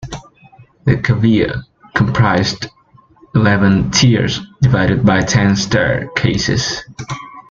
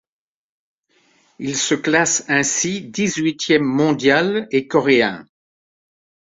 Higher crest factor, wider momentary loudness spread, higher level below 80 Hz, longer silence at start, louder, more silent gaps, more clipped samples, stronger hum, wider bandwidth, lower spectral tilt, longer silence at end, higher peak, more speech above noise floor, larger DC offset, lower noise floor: about the same, 14 dB vs 18 dB; first, 15 LU vs 6 LU; first, -36 dBFS vs -60 dBFS; second, 0 s vs 1.4 s; first, -14 LUFS vs -17 LUFS; neither; neither; neither; about the same, 7.6 kHz vs 8 kHz; first, -5.5 dB/octave vs -3.5 dB/octave; second, 0.1 s vs 1.15 s; about the same, 0 dBFS vs -2 dBFS; second, 33 dB vs 42 dB; neither; second, -47 dBFS vs -60 dBFS